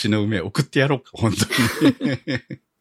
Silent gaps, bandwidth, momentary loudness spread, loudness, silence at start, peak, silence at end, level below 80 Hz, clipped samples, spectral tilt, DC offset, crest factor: none; 16 kHz; 9 LU; -21 LUFS; 0 s; -2 dBFS; 0.25 s; -52 dBFS; under 0.1%; -5 dB/octave; under 0.1%; 18 dB